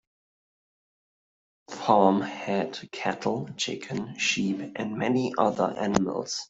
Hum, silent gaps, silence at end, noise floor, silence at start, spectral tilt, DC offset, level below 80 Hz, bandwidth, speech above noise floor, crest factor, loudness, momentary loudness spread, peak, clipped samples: none; none; 0.05 s; under -90 dBFS; 1.7 s; -4.5 dB/octave; under 0.1%; -64 dBFS; 8 kHz; over 63 dB; 24 dB; -27 LUFS; 11 LU; -4 dBFS; under 0.1%